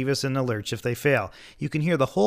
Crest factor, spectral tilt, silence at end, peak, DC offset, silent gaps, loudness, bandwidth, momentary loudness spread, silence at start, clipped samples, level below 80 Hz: 16 dB; -5.5 dB/octave; 0 s; -8 dBFS; under 0.1%; none; -26 LUFS; 15.5 kHz; 8 LU; 0 s; under 0.1%; -56 dBFS